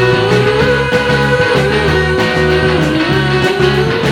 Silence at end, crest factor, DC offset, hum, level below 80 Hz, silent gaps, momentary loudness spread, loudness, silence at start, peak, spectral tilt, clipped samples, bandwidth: 0 s; 10 dB; under 0.1%; none; -28 dBFS; none; 2 LU; -11 LUFS; 0 s; -2 dBFS; -6 dB/octave; under 0.1%; 16.5 kHz